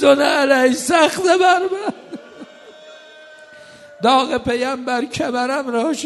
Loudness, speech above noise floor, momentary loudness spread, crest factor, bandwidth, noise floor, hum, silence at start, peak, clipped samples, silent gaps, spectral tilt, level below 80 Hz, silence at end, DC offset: -17 LUFS; 26 dB; 11 LU; 18 dB; 12.5 kHz; -42 dBFS; none; 0 s; 0 dBFS; under 0.1%; none; -3 dB/octave; -56 dBFS; 0 s; under 0.1%